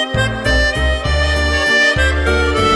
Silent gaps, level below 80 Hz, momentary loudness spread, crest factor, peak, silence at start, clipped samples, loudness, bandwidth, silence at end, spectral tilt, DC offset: none; -20 dBFS; 5 LU; 14 dB; -2 dBFS; 0 s; under 0.1%; -14 LUFS; 12 kHz; 0 s; -4.5 dB/octave; under 0.1%